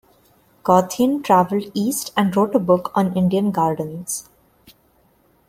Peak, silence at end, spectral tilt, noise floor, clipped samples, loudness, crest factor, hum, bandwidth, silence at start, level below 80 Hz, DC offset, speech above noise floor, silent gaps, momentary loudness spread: -2 dBFS; 1.3 s; -5.5 dB/octave; -58 dBFS; under 0.1%; -19 LUFS; 18 dB; none; 16.5 kHz; 0.65 s; -58 dBFS; under 0.1%; 40 dB; none; 10 LU